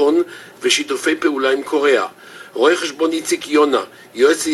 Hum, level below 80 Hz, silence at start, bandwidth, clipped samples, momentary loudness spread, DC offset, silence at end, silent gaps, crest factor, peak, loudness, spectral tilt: none; -64 dBFS; 0 s; 15 kHz; under 0.1%; 11 LU; under 0.1%; 0 s; none; 16 dB; 0 dBFS; -17 LUFS; -2 dB/octave